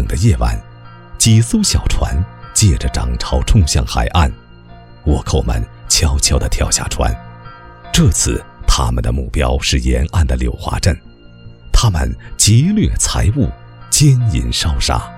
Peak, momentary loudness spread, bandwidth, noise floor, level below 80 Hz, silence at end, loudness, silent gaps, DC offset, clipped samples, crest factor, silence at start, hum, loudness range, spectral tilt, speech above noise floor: 0 dBFS; 9 LU; 16 kHz; -38 dBFS; -20 dBFS; 0 s; -15 LUFS; none; 0.4%; under 0.1%; 14 dB; 0 s; none; 3 LU; -4 dB/octave; 25 dB